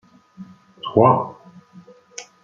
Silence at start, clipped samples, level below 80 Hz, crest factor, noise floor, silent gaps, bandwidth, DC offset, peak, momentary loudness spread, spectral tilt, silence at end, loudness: 0.4 s; under 0.1%; -62 dBFS; 20 dB; -47 dBFS; none; 7.8 kHz; under 0.1%; -2 dBFS; 23 LU; -7 dB/octave; 0.2 s; -17 LUFS